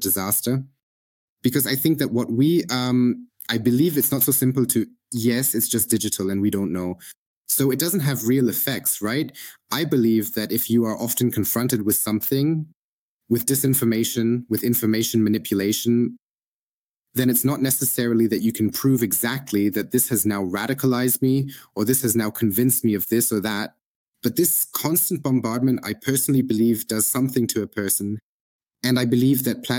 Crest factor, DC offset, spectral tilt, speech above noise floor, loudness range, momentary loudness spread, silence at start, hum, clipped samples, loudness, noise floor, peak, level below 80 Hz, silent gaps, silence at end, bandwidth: 18 dB; under 0.1%; -4.5 dB/octave; over 69 dB; 2 LU; 7 LU; 0 s; none; under 0.1%; -21 LUFS; under -90 dBFS; -4 dBFS; -64 dBFS; 0.83-1.37 s, 7.17-7.43 s, 12.75-13.20 s, 16.22-17.04 s, 23.82-24.13 s, 28.23-28.59 s; 0 s; 18 kHz